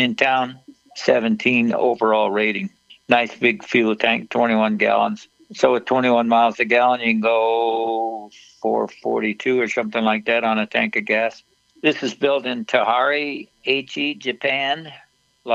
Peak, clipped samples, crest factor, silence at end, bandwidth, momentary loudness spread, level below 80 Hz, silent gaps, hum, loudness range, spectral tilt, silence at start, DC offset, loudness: 0 dBFS; under 0.1%; 20 dB; 0 s; 8 kHz; 8 LU; -70 dBFS; none; none; 3 LU; -5 dB/octave; 0 s; under 0.1%; -19 LUFS